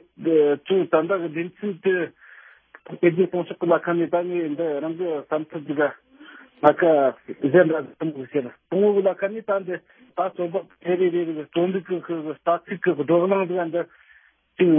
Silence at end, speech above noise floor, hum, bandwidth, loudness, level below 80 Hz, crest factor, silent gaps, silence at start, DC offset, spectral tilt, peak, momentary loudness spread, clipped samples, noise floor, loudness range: 0 s; 34 dB; none; 3.6 kHz; -23 LUFS; -74 dBFS; 22 dB; none; 0.2 s; under 0.1%; -10 dB/octave; 0 dBFS; 10 LU; under 0.1%; -56 dBFS; 4 LU